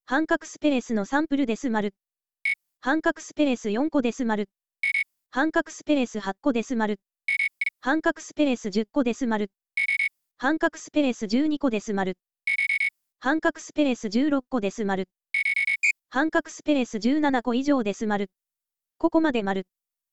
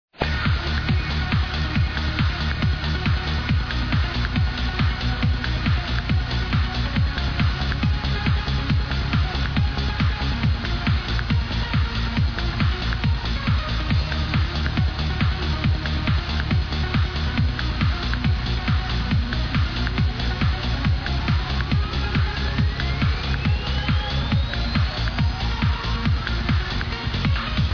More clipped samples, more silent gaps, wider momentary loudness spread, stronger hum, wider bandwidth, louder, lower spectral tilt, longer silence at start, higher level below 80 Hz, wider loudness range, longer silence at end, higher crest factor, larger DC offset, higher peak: neither; neither; first, 6 LU vs 1 LU; neither; first, 10 kHz vs 5.4 kHz; about the same, -25 LUFS vs -23 LUFS; second, -4.5 dB/octave vs -6.5 dB/octave; second, 0 s vs 0.2 s; second, -58 dBFS vs -26 dBFS; about the same, 2 LU vs 0 LU; about the same, 0 s vs 0 s; about the same, 18 dB vs 16 dB; first, 0.5% vs under 0.1%; about the same, -8 dBFS vs -6 dBFS